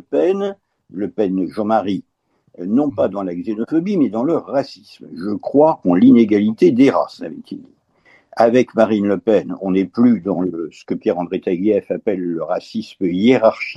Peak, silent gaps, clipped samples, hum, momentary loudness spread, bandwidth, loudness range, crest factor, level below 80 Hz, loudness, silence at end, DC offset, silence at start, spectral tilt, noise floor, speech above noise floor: 0 dBFS; none; under 0.1%; none; 15 LU; 7.8 kHz; 5 LU; 16 dB; -62 dBFS; -17 LUFS; 0 s; under 0.1%; 0.1 s; -8 dB/octave; -54 dBFS; 37 dB